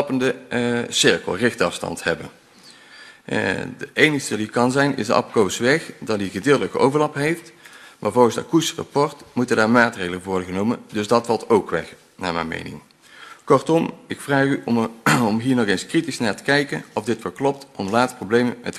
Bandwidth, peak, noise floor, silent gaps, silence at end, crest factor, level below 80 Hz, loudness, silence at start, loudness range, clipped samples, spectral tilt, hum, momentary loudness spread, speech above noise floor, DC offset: 13.5 kHz; 0 dBFS; -48 dBFS; none; 0 s; 20 dB; -58 dBFS; -21 LUFS; 0 s; 3 LU; under 0.1%; -4.5 dB/octave; none; 10 LU; 27 dB; under 0.1%